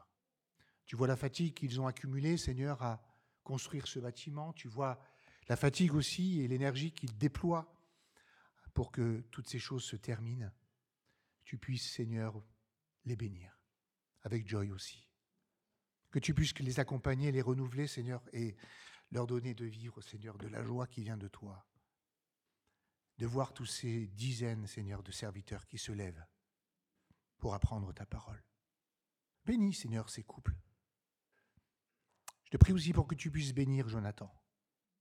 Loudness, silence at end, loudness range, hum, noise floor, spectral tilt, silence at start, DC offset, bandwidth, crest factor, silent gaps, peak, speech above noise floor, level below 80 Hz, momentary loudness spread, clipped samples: -38 LUFS; 0.7 s; 9 LU; none; under -90 dBFS; -6 dB/octave; 0.9 s; under 0.1%; 14 kHz; 30 dB; none; -8 dBFS; over 53 dB; -52 dBFS; 15 LU; under 0.1%